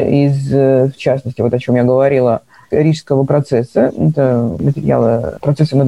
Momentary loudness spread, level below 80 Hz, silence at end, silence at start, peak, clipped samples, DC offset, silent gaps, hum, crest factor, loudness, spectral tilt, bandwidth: 5 LU; -44 dBFS; 0 s; 0 s; 0 dBFS; under 0.1%; 0.2%; none; none; 12 dB; -14 LUFS; -9 dB/octave; 10.5 kHz